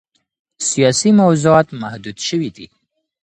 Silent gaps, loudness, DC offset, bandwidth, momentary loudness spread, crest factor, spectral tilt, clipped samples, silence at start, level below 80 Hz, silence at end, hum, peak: none; -15 LUFS; under 0.1%; 10 kHz; 15 LU; 16 dB; -5 dB/octave; under 0.1%; 0.6 s; -54 dBFS; 0.6 s; none; 0 dBFS